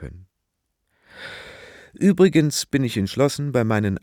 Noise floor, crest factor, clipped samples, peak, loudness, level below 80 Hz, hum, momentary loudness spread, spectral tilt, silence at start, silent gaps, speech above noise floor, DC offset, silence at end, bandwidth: -77 dBFS; 18 dB; under 0.1%; -4 dBFS; -20 LUFS; -52 dBFS; none; 22 LU; -6 dB/octave; 0 s; none; 57 dB; under 0.1%; 0.05 s; 18 kHz